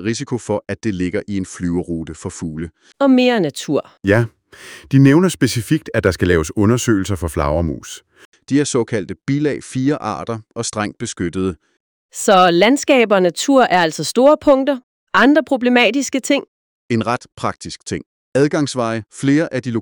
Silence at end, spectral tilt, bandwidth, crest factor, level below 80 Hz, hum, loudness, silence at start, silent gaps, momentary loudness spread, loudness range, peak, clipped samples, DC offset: 0 s; -5.5 dB/octave; 19.5 kHz; 16 dB; -42 dBFS; none; -17 LUFS; 0 s; 8.25-8.32 s, 11.80-12.09 s, 14.83-15.07 s, 16.48-16.89 s, 18.06-18.32 s; 14 LU; 7 LU; 0 dBFS; under 0.1%; under 0.1%